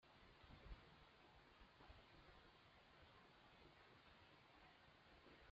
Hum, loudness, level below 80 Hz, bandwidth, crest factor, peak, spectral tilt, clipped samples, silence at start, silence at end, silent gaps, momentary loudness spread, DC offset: none; -68 LUFS; -72 dBFS; 7 kHz; 20 dB; -48 dBFS; -3 dB/octave; under 0.1%; 0 s; 0 s; none; 5 LU; under 0.1%